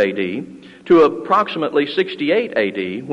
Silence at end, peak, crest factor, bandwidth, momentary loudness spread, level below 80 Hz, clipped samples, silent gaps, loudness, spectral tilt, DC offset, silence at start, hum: 0 s; -2 dBFS; 16 dB; 8 kHz; 12 LU; -58 dBFS; under 0.1%; none; -17 LUFS; -6.5 dB/octave; under 0.1%; 0 s; none